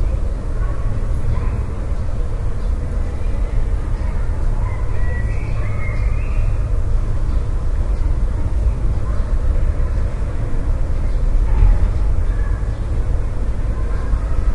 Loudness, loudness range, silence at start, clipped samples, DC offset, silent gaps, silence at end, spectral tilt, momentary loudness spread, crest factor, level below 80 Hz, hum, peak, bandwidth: -22 LUFS; 3 LU; 0 s; under 0.1%; under 0.1%; none; 0 s; -8 dB/octave; 4 LU; 14 dB; -18 dBFS; none; -2 dBFS; 7 kHz